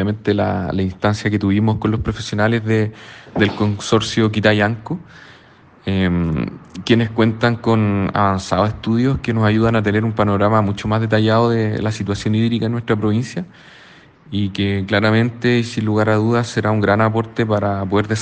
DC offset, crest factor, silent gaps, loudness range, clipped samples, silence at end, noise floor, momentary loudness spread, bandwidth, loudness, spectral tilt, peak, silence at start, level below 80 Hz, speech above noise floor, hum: under 0.1%; 18 dB; none; 3 LU; under 0.1%; 0 s; -47 dBFS; 7 LU; 9 kHz; -18 LUFS; -6.5 dB/octave; 0 dBFS; 0 s; -44 dBFS; 30 dB; none